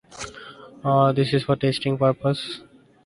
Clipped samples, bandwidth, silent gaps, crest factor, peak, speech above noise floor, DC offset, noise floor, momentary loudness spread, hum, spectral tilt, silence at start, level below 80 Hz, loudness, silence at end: under 0.1%; 11.5 kHz; none; 18 dB; -6 dBFS; 22 dB; under 0.1%; -43 dBFS; 18 LU; none; -6.5 dB/octave; 0.1 s; -56 dBFS; -22 LUFS; 0.45 s